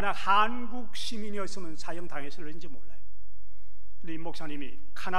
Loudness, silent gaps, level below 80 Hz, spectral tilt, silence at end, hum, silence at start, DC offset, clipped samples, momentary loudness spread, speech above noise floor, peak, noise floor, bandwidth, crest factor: -33 LUFS; none; -58 dBFS; -4.5 dB/octave; 0 s; none; 0 s; 9%; under 0.1%; 20 LU; 23 dB; -10 dBFS; -57 dBFS; 16 kHz; 22 dB